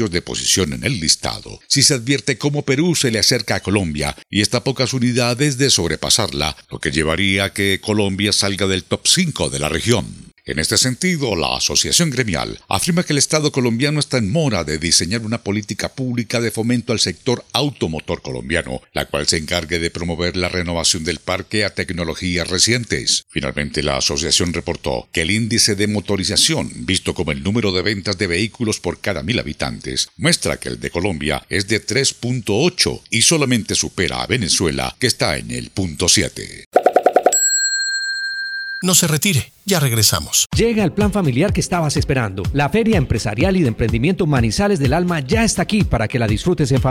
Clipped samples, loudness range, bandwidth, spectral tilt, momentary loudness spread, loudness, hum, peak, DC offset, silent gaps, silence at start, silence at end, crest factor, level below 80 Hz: under 0.1%; 4 LU; 17 kHz; -3.5 dB/octave; 8 LU; -17 LUFS; none; 0 dBFS; under 0.1%; 36.66-36.71 s, 40.46-40.50 s; 0 s; 0 s; 18 dB; -38 dBFS